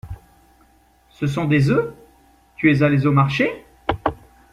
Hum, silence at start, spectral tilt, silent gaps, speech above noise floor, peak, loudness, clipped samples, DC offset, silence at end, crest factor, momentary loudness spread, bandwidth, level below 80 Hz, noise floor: none; 0.05 s; -8 dB/octave; none; 38 dB; -2 dBFS; -19 LUFS; under 0.1%; under 0.1%; 0.35 s; 18 dB; 12 LU; 10 kHz; -46 dBFS; -56 dBFS